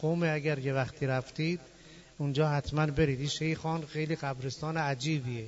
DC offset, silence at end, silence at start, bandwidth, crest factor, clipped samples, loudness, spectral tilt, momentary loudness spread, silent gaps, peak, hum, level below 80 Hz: under 0.1%; 0 s; 0 s; 8 kHz; 16 dB; under 0.1%; -32 LUFS; -6 dB/octave; 5 LU; none; -16 dBFS; none; -54 dBFS